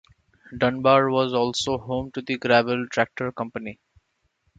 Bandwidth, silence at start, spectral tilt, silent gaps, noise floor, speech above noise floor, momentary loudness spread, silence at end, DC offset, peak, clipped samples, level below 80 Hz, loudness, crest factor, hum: 9.2 kHz; 0.5 s; -5 dB/octave; none; -70 dBFS; 48 dB; 13 LU; 0.85 s; under 0.1%; -4 dBFS; under 0.1%; -54 dBFS; -23 LUFS; 20 dB; none